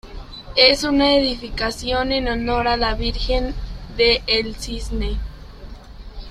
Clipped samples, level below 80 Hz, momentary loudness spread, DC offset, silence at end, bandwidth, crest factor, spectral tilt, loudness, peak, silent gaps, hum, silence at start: under 0.1%; -30 dBFS; 18 LU; under 0.1%; 0 s; 14.5 kHz; 20 dB; -4 dB/octave; -19 LUFS; 0 dBFS; none; none; 0.05 s